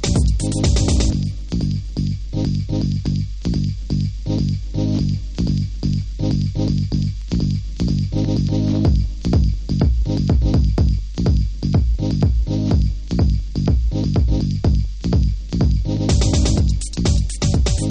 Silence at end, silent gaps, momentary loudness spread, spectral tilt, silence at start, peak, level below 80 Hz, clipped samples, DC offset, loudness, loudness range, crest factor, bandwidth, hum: 0 s; none; 5 LU; -6.5 dB/octave; 0 s; -4 dBFS; -22 dBFS; under 0.1%; under 0.1%; -20 LUFS; 3 LU; 14 dB; 10 kHz; none